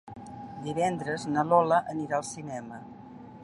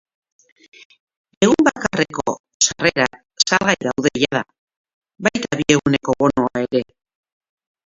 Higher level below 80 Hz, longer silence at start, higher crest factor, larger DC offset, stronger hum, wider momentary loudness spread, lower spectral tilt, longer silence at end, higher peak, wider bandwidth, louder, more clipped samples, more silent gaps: second, -66 dBFS vs -52 dBFS; second, 0.05 s vs 1.4 s; about the same, 20 dB vs 20 dB; neither; neither; first, 21 LU vs 8 LU; first, -5.5 dB/octave vs -3.5 dB/octave; second, 0 s vs 1.1 s; second, -10 dBFS vs 0 dBFS; first, 11.5 kHz vs 8 kHz; second, -28 LUFS vs -18 LUFS; neither; second, none vs 2.39-2.44 s, 2.54-2.60 s, 4.59-4.67 s, 4.77-4.84 s, 4.93-5.02 s